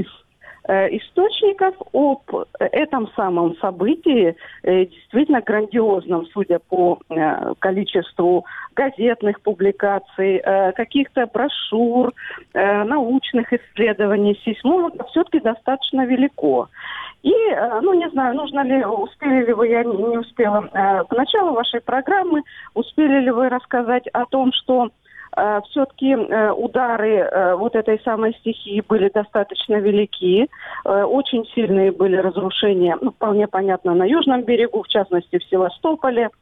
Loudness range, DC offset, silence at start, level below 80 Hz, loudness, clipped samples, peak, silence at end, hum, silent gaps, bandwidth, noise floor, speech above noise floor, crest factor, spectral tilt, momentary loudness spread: 2 LU; under 0.1%; 0 s; -60 dBFS; -19 LUFS; under 0.1%; -6 dBFS; 0.1 s; none; none; 4 kHz; -46 dBFS; 28 dB; 12 dB; -8.5 dB/octave; 5 LU